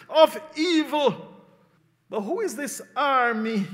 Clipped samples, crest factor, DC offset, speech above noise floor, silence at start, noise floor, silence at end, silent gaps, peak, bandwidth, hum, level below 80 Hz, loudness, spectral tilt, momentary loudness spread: under 0.1%; 22 dB; under 0.1%; 39 dB; 0.1 s; -63 dBFS; 0 s; none; -2 dBFS; 16 kHz; none; -82 dBFS; -24 LUFS; -4 dB/octave; 12 LU